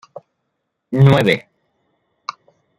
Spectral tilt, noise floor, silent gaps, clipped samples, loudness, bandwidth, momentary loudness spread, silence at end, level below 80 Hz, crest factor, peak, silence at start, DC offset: -7.5 dB/octave; -74 dBFS; none; under 0.1%; -15 LUFS; 11.5 kHz; 21 LU; 0.45 s; -52 dBFS; 18 dB; -2 dBFS; 0.9 s; under 0.1%